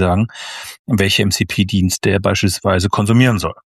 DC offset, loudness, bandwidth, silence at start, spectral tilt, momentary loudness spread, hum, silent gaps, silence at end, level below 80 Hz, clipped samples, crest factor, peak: under 0.1%; -15 LUFS; 14 kHz; 0 s; -5 dB/octave; 9 LU; none; 0.79-0.85 s; 0.2 s; -40 dBFS; under 0.1%; 14 dB; 0 dBFS